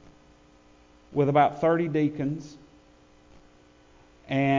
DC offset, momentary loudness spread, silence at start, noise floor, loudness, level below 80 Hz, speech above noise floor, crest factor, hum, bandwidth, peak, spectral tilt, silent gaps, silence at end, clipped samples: under 0.1%; 12 LU; 1.1 s; -56 dBFS; -25 LUFS; -60 dBFS; 32 dB; 18 dB; none; 7.6 kHz; -10 dBFS; -8 dB/octave; none; 0 s; under 0.1%